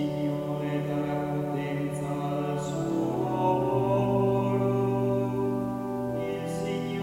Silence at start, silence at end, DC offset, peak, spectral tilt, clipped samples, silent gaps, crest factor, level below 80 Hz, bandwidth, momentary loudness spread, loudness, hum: 0 s; 0 s; under 0.1%; -14 dBFS; -8 dB/octave; under 0.1%; none; 14 dB; -56 dBFS; 16 kHz; 6 LU; -28 LUFS; none